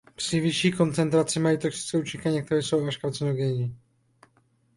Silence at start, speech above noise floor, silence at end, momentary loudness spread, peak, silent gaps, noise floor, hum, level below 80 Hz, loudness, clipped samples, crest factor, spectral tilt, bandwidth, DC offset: 0.2 s; 40 dB; 1 s; 6 LU; -10 dBFS; none; -65 dBFS; none; -60 dBFS; -26 LUFS; under 0.1%; 16 dB; -5.5 dB/octave; 11.5 kHz; under 0.1%